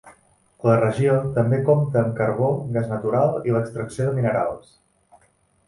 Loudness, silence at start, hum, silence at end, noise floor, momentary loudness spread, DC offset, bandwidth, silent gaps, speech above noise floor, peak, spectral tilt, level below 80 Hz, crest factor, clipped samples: -21 LUFS; 0.05 s; none; 1.1 s; -62 dBFS; 6 LU; under 0.1%; 11.5 kHz; none; 41 dB; -4 dBFS; -9 dB/octave; -54 dBFS; 18 dB; under 0.1%